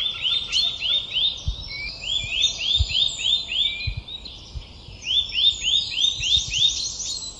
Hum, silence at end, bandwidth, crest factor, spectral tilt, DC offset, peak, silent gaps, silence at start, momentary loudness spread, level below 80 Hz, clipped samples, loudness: none; 0 s; 12 kHz; 16 dB; 0 dB/octave; under 0.1%; -8 dBFS; none; 0 s; 16 LU; -38 dBFS; under 0.1%; -20 LUFS